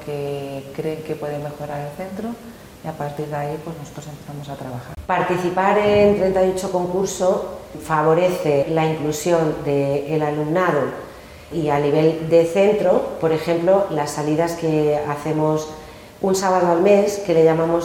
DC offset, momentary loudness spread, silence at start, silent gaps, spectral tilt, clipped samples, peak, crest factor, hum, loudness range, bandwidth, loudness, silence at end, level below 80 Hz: under 0.1%; 17 LU; 0 s; none; -6 dB/octave; under 0.1%; -2 dBFS; 16 dB; none; 10 LU; 17 kHz; -19 LUFS; 0 s; -48 dBFS